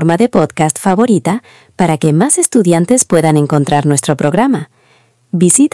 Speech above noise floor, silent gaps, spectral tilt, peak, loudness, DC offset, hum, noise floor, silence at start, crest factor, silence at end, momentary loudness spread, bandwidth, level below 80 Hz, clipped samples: 40 dB; none; -5.5 dB/octave; 0 dBFS; -11 LUFS; under 0.1%; none; -51 dBFS; 0 s; 12 dB; 0.05 s; 5 LU; 12 kHz; -50 dBFS; 0.4%